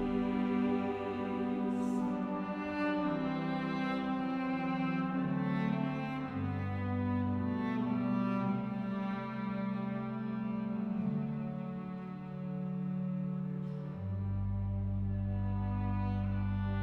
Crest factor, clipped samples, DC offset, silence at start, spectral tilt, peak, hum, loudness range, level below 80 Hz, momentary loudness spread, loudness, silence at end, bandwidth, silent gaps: 14 dB; under 0.1%; under 0.1%; 0 s; -9 dB/octave; -22 dBFS; none; 4 LU; -52 dBFS; 5 LU; -36 LUFS; 0 s; 7.6 kHz; none